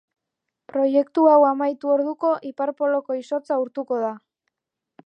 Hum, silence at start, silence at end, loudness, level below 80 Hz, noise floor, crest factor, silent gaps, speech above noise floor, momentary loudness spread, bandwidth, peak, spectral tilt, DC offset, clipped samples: none; 0.75 s; 0.9 s; -21 LUFS; -82 dBFS; -84 dBFS; 18 dB; none; 63 dB; 11 LU; 7.8 kHz; -4 dBFS; -6.5 dB/octave; under 0.1%; under 0.1%